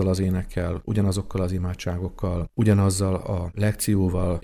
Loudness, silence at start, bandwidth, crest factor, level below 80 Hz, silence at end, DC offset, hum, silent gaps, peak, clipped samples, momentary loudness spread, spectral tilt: -24 LUFS; 0 s; 14.5 kHz; 18 dB; -38 dBFS; 0 s; under 0.1%; none; none; -6 dBFS; under 0.1%; 8 LU; -6.5 dB/octave